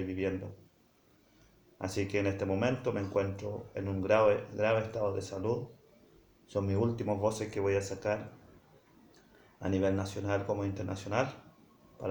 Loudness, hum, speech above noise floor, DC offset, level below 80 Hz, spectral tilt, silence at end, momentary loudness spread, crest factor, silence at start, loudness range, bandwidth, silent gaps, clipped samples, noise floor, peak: -33 LUFS; none; 34 dB; under 0.1%; -64 dBFS; -6.5 dB/octave; 0 s; 10 LU; 20 dB; 0 s; 4 LU; over 20 kHz; none; under 0.1%; -66 dBFS; -14 dBFS